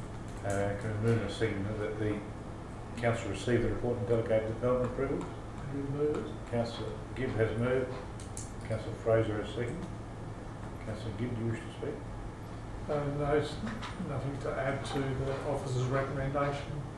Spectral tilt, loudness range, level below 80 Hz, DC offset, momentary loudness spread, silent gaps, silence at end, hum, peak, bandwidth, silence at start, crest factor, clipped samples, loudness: -6.5 dB/octave; 3 LU; -48 dBFS; under 0.1%; 12 LU; none; 0 s; none; -16 dBFS; 12 kHz; 0 s; 18 dB; under 0.1%; -34 LUFS